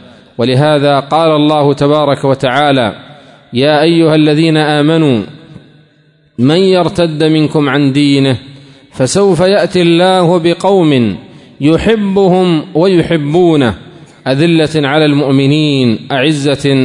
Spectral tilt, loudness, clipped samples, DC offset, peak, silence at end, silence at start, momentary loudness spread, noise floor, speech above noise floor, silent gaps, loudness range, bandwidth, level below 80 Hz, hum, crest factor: -6.5 dB/octave; -10 LUFS; under 0.1%; under 0.1%; 0 dBFS; 0 s; 0.4 s; 7 LU; -49 dBFS; 40 dB; none; 2 LU; 11 kHz; -44 dBFS; none; 10 dB